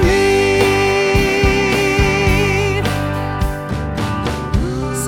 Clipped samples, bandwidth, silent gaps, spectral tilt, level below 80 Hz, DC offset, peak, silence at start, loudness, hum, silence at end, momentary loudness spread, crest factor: under 0.1%; 18 kHz; none; -5 dB/octave; -24 dBFS; under 0.1%; -2 dBFS; 0 s; -15 LUFS; 50 Hz at -40 dBFS; 0 s; 8 LU; 14 dB